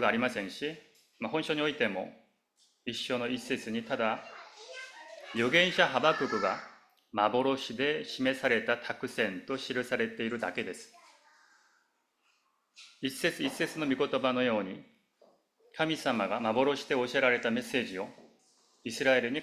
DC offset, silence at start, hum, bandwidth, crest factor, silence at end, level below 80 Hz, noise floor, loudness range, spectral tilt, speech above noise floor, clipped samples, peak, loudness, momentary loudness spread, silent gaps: under 0.1%; 0 s; none; 15 kHz; 24 dB; 0 s; -74 dBFS; -75 dBFS; 8 LU; -4 dB/octave; 44 dB; under 0.1%; -8 dBFS; -31 LUFS; 17 LU; none